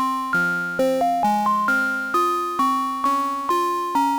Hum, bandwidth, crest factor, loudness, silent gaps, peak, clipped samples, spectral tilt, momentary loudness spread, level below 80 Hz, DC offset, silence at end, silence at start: none; over 20 kHz; 10 dB; -21 LUFS; none; -10 dBFS; under 0.1%; -4.5 dB/octave; 2 LU; -60 dBFS; under 0.1%; 0 s; 0 s